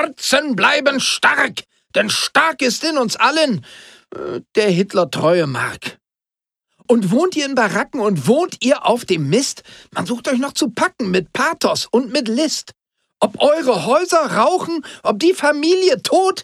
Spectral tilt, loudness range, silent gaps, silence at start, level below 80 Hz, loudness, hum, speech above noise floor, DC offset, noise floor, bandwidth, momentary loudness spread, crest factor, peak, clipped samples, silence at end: -4 dB/octave; 3 LU; none; 0 s; -62 dBFS; -16 LUFS; none; 70 dB; under 0.1%; -87 dBFS; 15 kHz; 9 LU; 16 dB; -2 dBFS; under 0.1%; 0 s